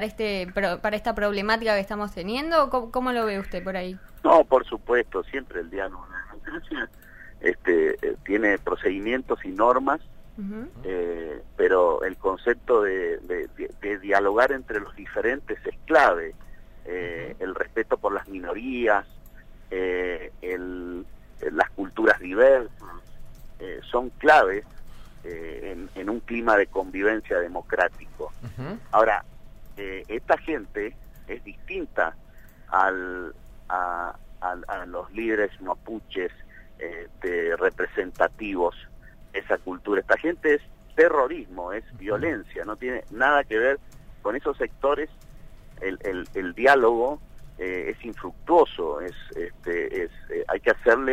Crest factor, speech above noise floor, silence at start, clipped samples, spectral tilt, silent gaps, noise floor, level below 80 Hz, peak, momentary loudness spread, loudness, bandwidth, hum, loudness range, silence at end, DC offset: 22 dB; 20 dB; 0 s; under 0.1%; -5.5 dB/octave; none; -45 dBFS; -46 dBFS; -4 dBFS; 16 LU; -25 LUFS; 15.5 kHz; none; 5 LU; 0 s; under 0.1%